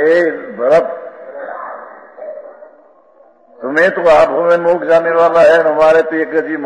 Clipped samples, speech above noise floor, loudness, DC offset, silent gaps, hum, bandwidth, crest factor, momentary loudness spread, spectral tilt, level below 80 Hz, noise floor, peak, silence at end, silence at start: under 0.1%; 36 dB; -11 LUFS; under 0.1%; none; none; 10 kHz; 12 dB; 21 LU; -5.5 dB/octave; -52 dBFS; -47 dBFS; 0 dBFS; 0 s; 0 s